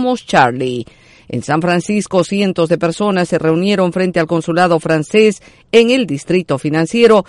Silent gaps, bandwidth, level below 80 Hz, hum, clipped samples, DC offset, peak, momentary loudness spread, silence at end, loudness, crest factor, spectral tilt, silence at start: none; 11.5 kHz; -50 dBFS; none; under 0.1%; under 0.1%; 0 dBFS; 7 LU; 0.05 s; -14 LUFS; 14 dB; -5.5 dB/octave; 0 s